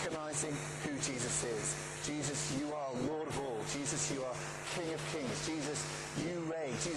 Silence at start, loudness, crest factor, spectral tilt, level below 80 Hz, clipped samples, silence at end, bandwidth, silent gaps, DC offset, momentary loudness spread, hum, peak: 0 s; -38 LUFS; 14 dB; -3.5 dB/octave; -62 dBFS; under 0.1%; 0 s; 13 kHz; none; under 0.1%; 4 LU; none; -24 dBFS